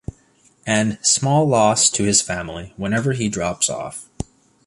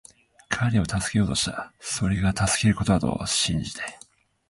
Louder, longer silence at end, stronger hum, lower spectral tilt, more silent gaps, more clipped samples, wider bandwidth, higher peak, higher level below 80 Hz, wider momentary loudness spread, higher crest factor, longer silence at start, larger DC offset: first, -18 LUFS vs -24 LUFS; about the same, 0.45 s vs 0.55 s; neither; about the same, -3.5 dB/octave vs -4 dB/octave; neither; neither; about the same, 11.5 kHz vs 11.5 kHz; first, 0 dBFS vs -4 dBFS; about the same, -46 dBFS vs -42 dBFS; first, 19 LU vs 10 LU; about the same, 20 dB vs 20 dB; first, 0.65 s vs 0.5 s; neither